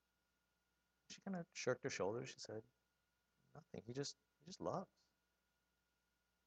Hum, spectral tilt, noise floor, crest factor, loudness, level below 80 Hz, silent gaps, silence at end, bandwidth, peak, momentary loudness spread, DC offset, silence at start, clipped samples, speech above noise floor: none; -4.5 dB/octave; -87 dBFS; 24 dB; -48 LUFS; -86 dBFS; none; 1.6 s; 8.8 kHz; -28 dBFS; 17 LU; under 0.1%; 1.1 s; under 0.1%; 39 dB